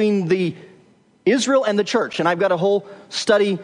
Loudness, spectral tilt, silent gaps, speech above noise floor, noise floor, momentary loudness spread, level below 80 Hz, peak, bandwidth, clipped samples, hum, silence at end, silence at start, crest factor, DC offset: -19 LUFS; -5 dB/octave; none; 35 dB; -54 dBFS; 7 LU; -72 dBFS; -4 dBFS; 10.5 kHz; under 0.1%; none; 0 s; 0 s; 16 dB; under 0.1%